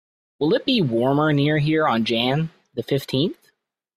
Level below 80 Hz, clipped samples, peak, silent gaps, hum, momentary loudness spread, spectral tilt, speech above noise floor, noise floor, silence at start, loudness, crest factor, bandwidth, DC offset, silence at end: -58 dBFS; under 0.1%; -4 dBFS; none; none; 7 LU; -7 dB/octave; 46 dB; -66 dBFS; 0.4 s; -21 LUFS; 18 dB; 14.5 kHz; under 0.1%; 0.65 s